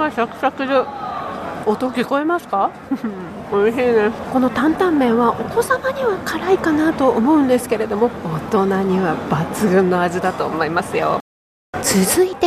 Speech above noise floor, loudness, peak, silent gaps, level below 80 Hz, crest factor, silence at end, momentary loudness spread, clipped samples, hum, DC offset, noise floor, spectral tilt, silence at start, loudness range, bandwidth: over 73 dB; -18 LUFS; -4 dBFS; 11.21-11.73 s; -50 dBFS; 14 dB; 0 s; 9 LU; under 0.1%; none; under 0.1%; under -90 dBFS; -5 dB/octave; 0 s; 3 LU; 15.5 kHz